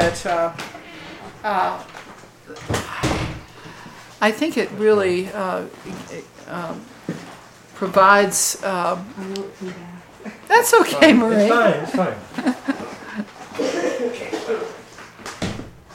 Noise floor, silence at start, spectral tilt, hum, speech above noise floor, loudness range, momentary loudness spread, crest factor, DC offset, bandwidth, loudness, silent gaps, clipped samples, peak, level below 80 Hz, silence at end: -42 dBFS; 0 s; -4 dB/octave; none; 23 dB; 9 LU; 24 LU; 20 dB; under 0.1%; 17 kHz; -19 LUFS; none; under 0.1%; 0 dBFS; -48 dBFS; 0 s